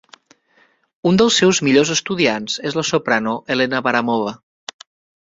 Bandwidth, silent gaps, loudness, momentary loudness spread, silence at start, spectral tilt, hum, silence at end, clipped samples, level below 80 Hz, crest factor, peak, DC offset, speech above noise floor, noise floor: 7.8 kHz; none; -17 LUFS; 14 LU; 1.05 s; -4 dB/octave; none; 0.85 s; under 0.1%; -58 dBFS; 18 dB; -2 dBFS; under 0.1%; 41 dB; -58 dBFS